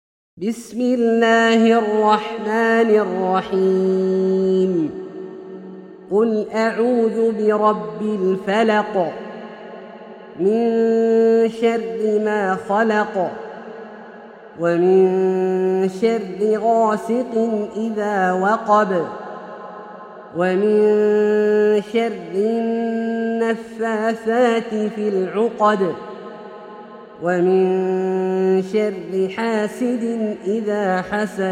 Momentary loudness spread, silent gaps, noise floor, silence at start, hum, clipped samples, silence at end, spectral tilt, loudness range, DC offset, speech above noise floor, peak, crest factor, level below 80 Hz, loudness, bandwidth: 19 LU; none; -39 dBFS; 0.35 s; none; under 0.1%; 0 s; -6.5 dB/octave; 4 LU; under 0.1%; 22 dB; -2 dBFS; 16 dB; -64 dBFS; -18 LUFS; 10.5 kHz